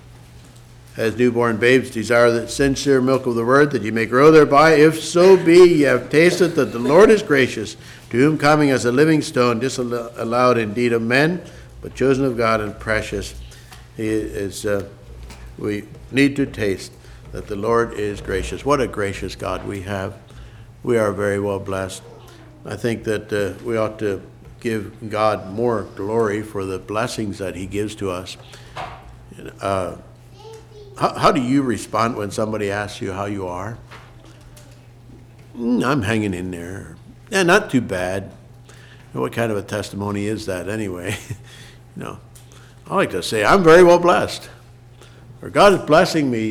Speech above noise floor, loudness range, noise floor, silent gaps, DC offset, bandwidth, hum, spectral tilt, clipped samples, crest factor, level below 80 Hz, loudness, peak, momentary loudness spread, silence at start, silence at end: 26 dB; 12 LU; -44 dBFS; none; under 0.1%; 15.5 kHz; none; -5.5 dB/octave; under 0.1%; 16 dB; -44 dBFS; -18 LUFS; -2 dBFS; 20 LU; 0.35 s; 0 s